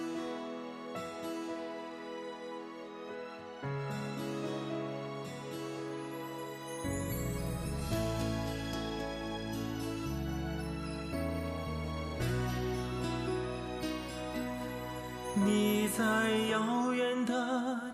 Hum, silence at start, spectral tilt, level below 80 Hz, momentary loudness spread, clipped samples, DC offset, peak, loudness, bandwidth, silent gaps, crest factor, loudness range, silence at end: none; 0 s; -5.5 dB/octave; -50 dBFS; 12 LU; under 0.1%; under 0.1%; -20 dBFS; -36 LUFS; 13.5 kHz; none; 16 dB; 9 LU; 0 s